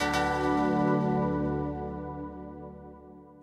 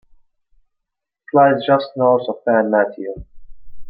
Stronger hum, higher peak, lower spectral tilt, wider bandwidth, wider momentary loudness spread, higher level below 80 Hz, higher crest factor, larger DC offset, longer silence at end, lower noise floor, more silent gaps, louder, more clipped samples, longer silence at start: neither; second, -16 dBFS vs -2 dBFS; second, -6.5 dB/octave vs -10.5 dB/octave; first, 14 kHz vs 5.2 kHz; first, 19 LU vs 15 LU; about the same, -48 dBFS vs -48 dBFS; about the same, 14 dB vs 16 dB; neither; about the same, 0 s vs 0 s; second, -50 dBFS vs -79 dBFS; neither; second, -29 LUFS vs -16 LUFS; neither; second, 0 s vs 1.35 s